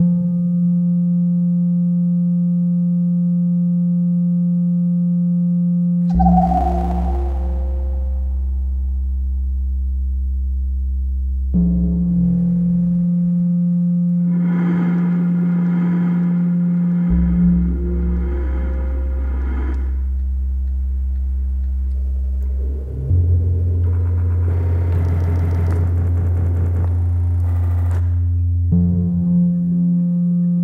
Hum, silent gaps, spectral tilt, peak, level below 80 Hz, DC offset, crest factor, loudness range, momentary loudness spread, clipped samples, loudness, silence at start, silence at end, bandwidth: none; none; -11.5 dB/octave; -2 dBFS; -24 dBFS; under 0.1%; 14 dB; 5 LU; 6 LU; under 0.1%; -18 LUFS; 0 s; 0 s; 2.3 kHz